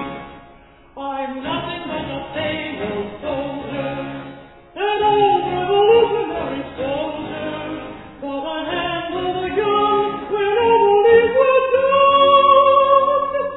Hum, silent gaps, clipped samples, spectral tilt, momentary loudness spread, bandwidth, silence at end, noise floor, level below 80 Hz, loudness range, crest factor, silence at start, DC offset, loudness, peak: none; none; under 0.1%; -8.5 dB/octave; 16 LU; 4.1 kHz; 0 s; -46 dBFS; -48 dBFS; 12 LU; 16 dB; 0 s; under 0.1%; -17 LUFS; -2 dBFS